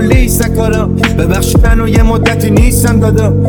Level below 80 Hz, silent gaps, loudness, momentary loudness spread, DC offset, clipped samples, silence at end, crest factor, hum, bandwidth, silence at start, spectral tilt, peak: -14 dBFS; none; -10 LUFS; 3 LU; under 0.1%; 0.5%; 0 s; 8 dB; none; over 20 kHz; 0 s; -6 dB/octave; 0 dBFS